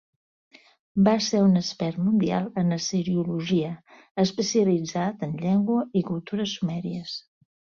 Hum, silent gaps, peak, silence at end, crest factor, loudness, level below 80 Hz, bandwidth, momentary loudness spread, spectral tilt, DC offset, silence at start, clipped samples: none; 4.11-4.15 s; -8 dBFS; 0.55 s; 18 dB; -25 LUFS; -62 dBFS; 7.2 kHz; 11 LU; -6 dB/octave; under 0.1%; 0.95 s; under 0.1%